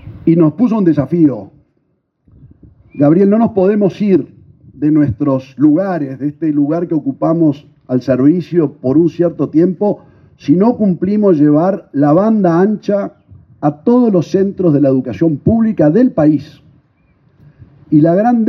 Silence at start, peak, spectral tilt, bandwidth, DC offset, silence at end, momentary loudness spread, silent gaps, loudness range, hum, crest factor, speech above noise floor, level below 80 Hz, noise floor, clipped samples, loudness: 0.05 s; 0 dBFS; -10 dB/octave; 6.2 kHz; under 0.1%; 0 s; 8 LU; none; 2 LU; none; 12 dB; 51 dB; -52 dBFS; -62 dBFS; under 0.1%; -13 LUFS